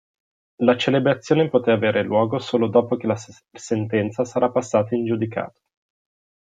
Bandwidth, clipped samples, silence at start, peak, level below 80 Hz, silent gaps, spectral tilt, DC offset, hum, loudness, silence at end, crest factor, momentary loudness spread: 9.2 kHz; under 0.1%; 0.6 s; -4 dBFS; -64 dBFS; none; -6.5 dB/octave; under 0.1%; none; -21 LUFS; 0.9 s; 18 dB; 8 LU